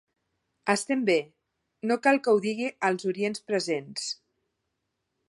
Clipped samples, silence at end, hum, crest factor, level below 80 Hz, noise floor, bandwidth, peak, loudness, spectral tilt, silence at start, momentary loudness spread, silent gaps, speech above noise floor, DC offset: under 0.1%; 1.15 s; none; 22 dB; -78 dBFS; -81 dBFS; 11.5 kHz; -6 dBFS; -27 LUFS; -4 dB/octave; 0.65 s; 11 LU; none; 54 dB; under 0.1%